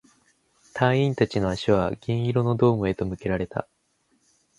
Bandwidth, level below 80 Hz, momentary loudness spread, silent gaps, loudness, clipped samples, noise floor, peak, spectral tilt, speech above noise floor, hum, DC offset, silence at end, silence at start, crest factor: 11 kHz; -48 dBFS; 7 LU; none; -24 LUFS; under 0.1%; -68 dBFS; -4 dBFS; -7.5 dB/octave; 45 dB; none; under 0.1%; 0.95 s; 0.75 s; 20 dB